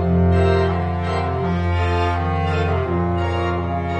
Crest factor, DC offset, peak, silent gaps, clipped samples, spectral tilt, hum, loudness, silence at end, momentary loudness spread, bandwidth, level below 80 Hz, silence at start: 14 dB; under 0.1%; -4 dBFS; none; under 0.1%; -8 dB/octave; none; -20 LUFS; 0 s; 5 LU; 8.4 kHz; -32 dBFS; 0 s